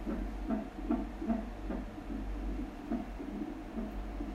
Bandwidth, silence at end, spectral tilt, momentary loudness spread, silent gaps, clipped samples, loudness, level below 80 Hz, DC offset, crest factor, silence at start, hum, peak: 12.5 kHz; 0 s; -8 dB/octave; 6 LU; none; under 0.1%; -40 LUFS; -42 dBFS; under 0.1%; 16 dB; 0 s; none; -20 dBFS